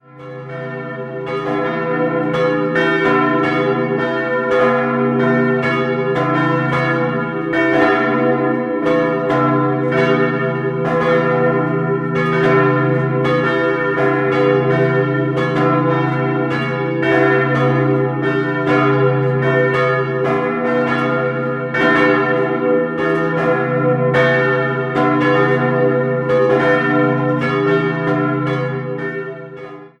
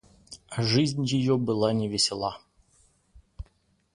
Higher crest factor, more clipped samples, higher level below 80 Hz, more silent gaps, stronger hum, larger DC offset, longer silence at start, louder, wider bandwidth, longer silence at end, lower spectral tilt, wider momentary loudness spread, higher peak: about the same, 14 dB vs 18 dB; neither; about the same, -52 dBFS vs -54 dBFS; neither; neither; neither; second, 0.15 s vs 0.3 s; first, -16 LUFS vs -26 LUFS; second, 8.4 kHz vs 11.5 kHz; second, 0.1 s vs 0.5 s; first, -8 dB/octave vs -5 dB/octave; second, 6 LU vs 23 LU; first, -2 dBFS vs -10 dBFS